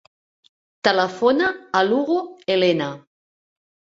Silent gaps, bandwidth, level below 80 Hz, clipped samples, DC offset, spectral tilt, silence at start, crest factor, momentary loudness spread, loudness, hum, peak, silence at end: none; 7.6 kHz; -64 dBFS; under 0.1%; under 0.1%; -5 dB/octave; 0.85 s; 20 dB; 6 LU; -20 LUFS; none; -2 dBFS; 1 s